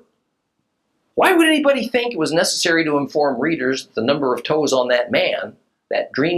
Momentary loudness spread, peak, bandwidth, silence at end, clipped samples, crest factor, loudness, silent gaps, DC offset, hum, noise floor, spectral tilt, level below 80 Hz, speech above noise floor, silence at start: 9 LU; -2 dBFS; 14 kHz; 0 s; under 0.1%; 18 dB; -18 LUFS; none; under 0.1%; none; -72 dBFS; -3.5 dB/octave; -64 dBFS; 54 dB; 1.15 s